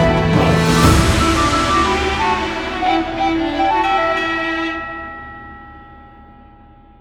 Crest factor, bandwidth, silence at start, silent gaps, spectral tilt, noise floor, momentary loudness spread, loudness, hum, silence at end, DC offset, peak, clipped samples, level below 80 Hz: 16 dB; 18 kHz; 0 s; none; -5 dB/octave; -44 dBFS; 17 LU; -16 LUFS; none; 0.8 s; under 0.1%; 0 dBFS; under 0.1%; -28 dBFS